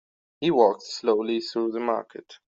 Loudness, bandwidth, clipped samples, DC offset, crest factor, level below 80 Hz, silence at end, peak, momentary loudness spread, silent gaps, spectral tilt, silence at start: -25 LUFS; 7.8 kHz; under 0.1%; under 0.1%; 20 dB; -70 dBFS; 0.15 s; -6 dBFS; 8 LU; none; -5.5 dB/octave; 0.4 s